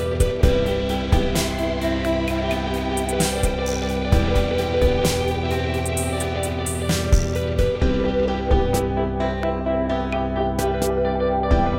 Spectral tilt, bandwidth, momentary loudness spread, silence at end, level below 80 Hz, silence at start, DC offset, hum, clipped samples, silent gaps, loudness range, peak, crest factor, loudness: -5.5 dB/octave; 16.5 kHz; 4 LU; 0 s; -26 dBFS; 0 s; under 0.1%; none; under 0.1%; none; 1 LU; -2 dBFS; 18 dB; -22 LUFS